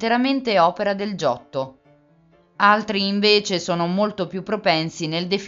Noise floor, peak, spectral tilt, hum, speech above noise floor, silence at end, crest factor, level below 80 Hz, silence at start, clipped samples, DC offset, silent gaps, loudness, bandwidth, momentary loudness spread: -56 dBFS; -2 dBFS; -4.5 dB/octave; none; 36 dB; 0 s; 20 dB; -62 dBFS; 0 s; under 0.1%; under 0.1%; none; -20 LUFS; 7.8 kHz; 10 LU